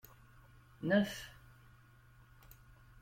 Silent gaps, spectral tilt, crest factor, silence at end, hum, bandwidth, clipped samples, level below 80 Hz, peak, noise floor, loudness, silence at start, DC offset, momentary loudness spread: none; -6 dB/octave; 24 dB; 0.5 s; none; 16.5 kHz; under 0.1%; -66 dBFS; -18 dBFS; -62 dBFS; -36 LUFS; 0.8 s; under 0.1%; 27 LU